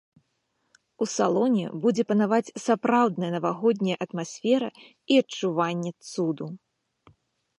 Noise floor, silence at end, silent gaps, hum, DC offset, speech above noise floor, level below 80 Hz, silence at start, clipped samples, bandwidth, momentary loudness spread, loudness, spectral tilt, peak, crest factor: -75 dBFS; 1 s; none; none; under 0.1%; 50 dB; -76 dBFS; 1 s; under 0.1%; 11.5 kHz; 10 LU; -25 LUFS; -5.5 dB/octave; -8 dBFS; 18 dB